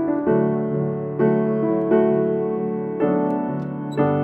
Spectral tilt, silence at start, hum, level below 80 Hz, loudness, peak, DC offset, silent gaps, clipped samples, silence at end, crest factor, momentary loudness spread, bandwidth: -10.5 dB/octave; 0 s; none; -58 dBFS; -21 LUFS; -6 dBFS; under 0.1%; none; under 0.1%; 0 s; 14 dB; 7 LU; 8.2 kHz